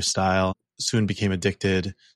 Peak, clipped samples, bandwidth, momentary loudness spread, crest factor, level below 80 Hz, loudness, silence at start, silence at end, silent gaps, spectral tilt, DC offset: -10 dBFS; under 0.1%; 12.5 kHz; 5 LU; 14 dB; -54 dBFS; -24 LUFS; 0 s; 0.25 s; none; -4.5 dB/octave; under 0.1%